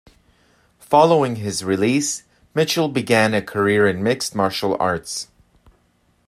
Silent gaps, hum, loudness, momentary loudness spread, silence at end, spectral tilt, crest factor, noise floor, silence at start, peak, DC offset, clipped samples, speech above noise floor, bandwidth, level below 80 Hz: none; none; -19 LUFS; 11 LU; 1.05 s; -4.5 dB/octave; 20 dB; -62 dBFS; 0.9 s; 0 dBFS; under 0.1%; under 0.1%; 43 dB; 14.5 kHz; -58 dBFS